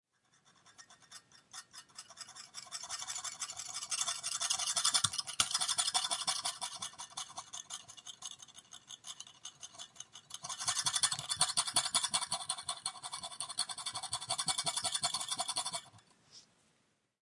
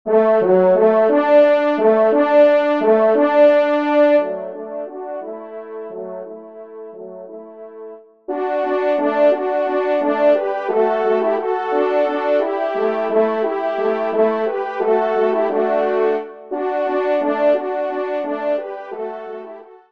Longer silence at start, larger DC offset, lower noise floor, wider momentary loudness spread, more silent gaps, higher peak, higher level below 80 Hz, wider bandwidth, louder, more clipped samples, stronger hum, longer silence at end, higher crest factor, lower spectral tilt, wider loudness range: first, 0.65 s vs 0.05 s; second, under 0.1% vs 0.2%; first, -76 dBFS vs -37 dBFS; about the same, 19 LU vs 20 LU; neither; second, -12 dBFS vs -2 dBFS; second, -78 dBFS vs -72 dBFS; first, 11.5 kHz vs 5.6 kHz; second, -35 LUFS vs -17 LUFS; neither; neither; first, 0.8 s vs 0.15 s; first, 28 dB vs 16 dB; second, 1 dB/octave vs -7.5 dB/octave; about the same, 13 LU vs 12 LU